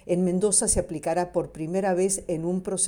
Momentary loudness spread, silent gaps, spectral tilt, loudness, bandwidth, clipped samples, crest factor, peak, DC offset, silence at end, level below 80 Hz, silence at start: 8 LU; none; -4.5 dB/octave; -25 LUFS; 18 kHz; under 0.1%; 18 dB; -8 dBFS; under 0.1%; 0 s; -44 dBFS; 0.05 s